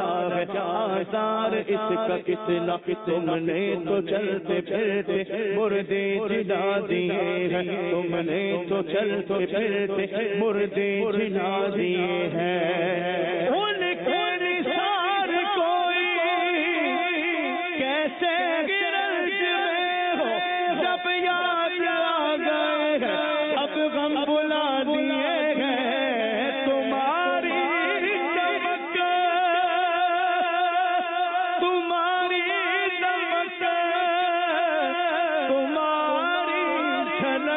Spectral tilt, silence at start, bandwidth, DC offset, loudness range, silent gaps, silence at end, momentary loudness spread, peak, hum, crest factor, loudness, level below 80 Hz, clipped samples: -9.5 dB/octave; 0 s; 4 kHz; under 0.1%; 2 LU; none; 0 s; 3 LU; -14 dBFS; none; 10 dB; -24 LUFS; -68 dBFS; under 0.1%